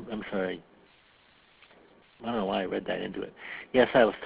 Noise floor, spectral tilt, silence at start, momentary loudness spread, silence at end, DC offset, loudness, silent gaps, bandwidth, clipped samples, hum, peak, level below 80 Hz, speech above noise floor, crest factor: -61 dBFS; -3.5 dB/octave; 0 s; 17 LU; 0 s; under 0.1%; -29 LUFS; none; 4 kHz; under 0.1%; none; -8 dBFS; -60 dBFS; 33 dB; 22 dB